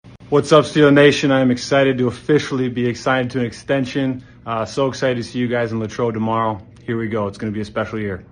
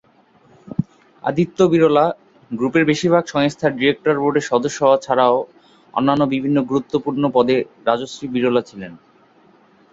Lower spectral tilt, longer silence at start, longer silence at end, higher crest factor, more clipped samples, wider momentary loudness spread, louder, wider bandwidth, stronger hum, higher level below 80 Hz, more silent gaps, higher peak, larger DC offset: about the same, -6 dB/octave vs -6 dB/octave; second, 0.05 s vs 0.65 s; second, 0.1 s vs 0.95 s; about the same, 18 dB vs 16 dB; neither; about the same, 11 LU vs 11 LU; about the same, -18 LUFS vs -18 LUFS; first, 10 kHz vs 7.8 kHz; neither; first, -50 dBFS vs -56 dBFS; neither; about the same, 0 dBFS vs -2 dBFS; neither